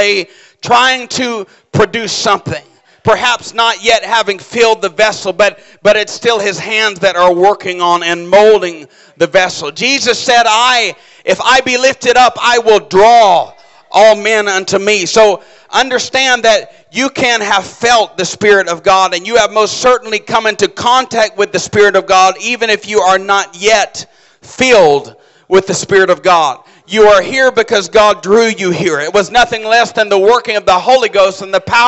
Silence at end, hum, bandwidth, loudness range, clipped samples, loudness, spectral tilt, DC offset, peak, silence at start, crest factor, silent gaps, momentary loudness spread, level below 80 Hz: 0 s; none; 8.4 kHz; 3 LU; under 0.1%; -10 LUFS; -2.5 dB/octave; under 0.1%; 0 dBFS; 0 s; 10 dB; none; 8 LU; -46 dBFS